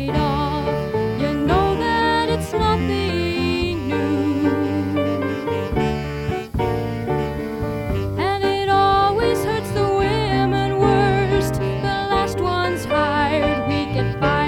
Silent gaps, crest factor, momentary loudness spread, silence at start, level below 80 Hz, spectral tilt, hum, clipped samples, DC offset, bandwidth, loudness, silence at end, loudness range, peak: none; 16 dB; 6 LU; 0 s; -34 dBFS; -6.5 dB/octave; none; under 0.1%; under 0.1%; 18 kHz; -20 LUFS; 0 s; 4 LU; -4 dBFS